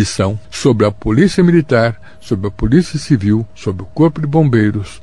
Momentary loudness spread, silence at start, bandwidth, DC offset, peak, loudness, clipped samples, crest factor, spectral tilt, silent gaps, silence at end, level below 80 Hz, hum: 10 LU; 0 s; 11 kHz; 2%; 0 dBFS; -14 LUFS; under 0.1%; 14 dB; -7 dB/octave; none; 0.05 s; -32 dBFS; none